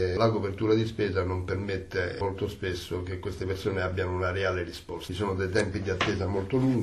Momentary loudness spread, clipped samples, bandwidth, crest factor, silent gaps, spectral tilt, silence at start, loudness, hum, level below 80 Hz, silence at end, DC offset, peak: 8 LU; under 0.1%; 13.5 kHz; 18 dB; none; -6.5 dB/octave; 0 s; -29 LUFS; none; -50 dBFS; 0 s; under 0.1%; -10 dBFS